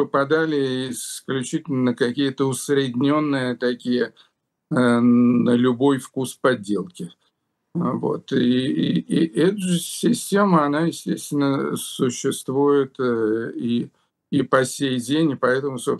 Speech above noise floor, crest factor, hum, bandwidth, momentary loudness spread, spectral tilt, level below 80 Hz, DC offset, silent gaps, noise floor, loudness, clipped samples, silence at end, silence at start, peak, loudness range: 51 dB; 18 dB; none; 12.5 kHz; 9 LU; -5.5 dB/octave; -68 dBFS; under 0.1%; none; -71 dBFS; -21 LUFS; under 0.1%; 0 s; 0 s; -2 dBFS; 3 LU